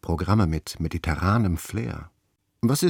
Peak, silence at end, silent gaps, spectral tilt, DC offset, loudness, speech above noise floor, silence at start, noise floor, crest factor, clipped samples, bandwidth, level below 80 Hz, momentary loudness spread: -8 dBFS; 0 s; none; -6 dB/octave; under 0.1%; -25 LUFS; 48 dB; 0.05 s; -71 dBFS; 18 dB; under 0.1%; 19 kHz; -40 dBFS; 9 LU